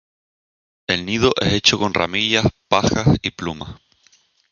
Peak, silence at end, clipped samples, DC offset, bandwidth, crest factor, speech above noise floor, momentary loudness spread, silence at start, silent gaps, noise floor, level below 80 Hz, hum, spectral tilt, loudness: 0 dBFS; 0.8 s; under 0.1%; under 0.1%; 7.4 kHz; 20 dB; 39 dB; 13 LU; 0.9 s; none; -57 dBFS; -40 dBFS; none; -4.5 dB/octave; -18 LUFS